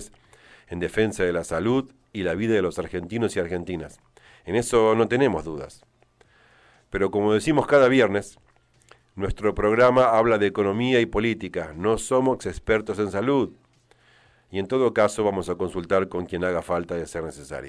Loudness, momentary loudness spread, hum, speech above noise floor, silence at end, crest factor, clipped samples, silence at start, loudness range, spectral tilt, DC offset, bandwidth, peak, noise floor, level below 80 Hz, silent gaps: -23 LUFS; 14 LU; none; 37 dB; 0 s; 18 dB; under 0.1%; 0 s; 5 LU; -5.5 dB/octave; under 0.1%; 11 kHz; -6 dBFS; -59 dBFS; -46 dBFS; none